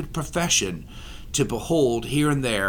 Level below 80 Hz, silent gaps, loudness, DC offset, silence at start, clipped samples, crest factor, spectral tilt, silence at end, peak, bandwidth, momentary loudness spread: -40 dBFS; none; -23 LUFS; under 0.1%; 0 s; under 0.1%; 16 dB; -4 dB/octave; 0 s; -8 dBFS; 19 kHz; 15 LU